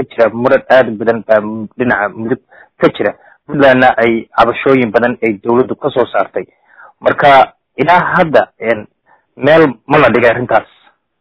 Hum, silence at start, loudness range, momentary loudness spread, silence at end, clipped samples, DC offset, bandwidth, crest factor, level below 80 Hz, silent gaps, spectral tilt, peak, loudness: none; 0 s; 2 LU; 10 LU; 0.55 s; 1%; under 0.1%; 5.4 kHz; 12 dB; -48 dBFS; none; -8 dB/octave; 0 dBFS; -11 LUFS